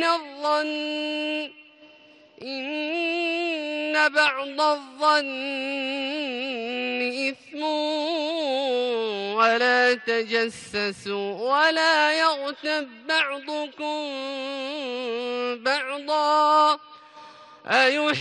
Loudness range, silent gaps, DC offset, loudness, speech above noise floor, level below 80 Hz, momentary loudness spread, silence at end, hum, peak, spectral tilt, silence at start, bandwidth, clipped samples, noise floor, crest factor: 5 LU; none; under 0.1%; -24 LUFS; 28 dB; -74 dBFS; 11 LU; 0 s; none; -6 dBFS; -2.5 dB/octave; 0 s; 11 kHz; under 0.1%; -53 dBFS; 18 dB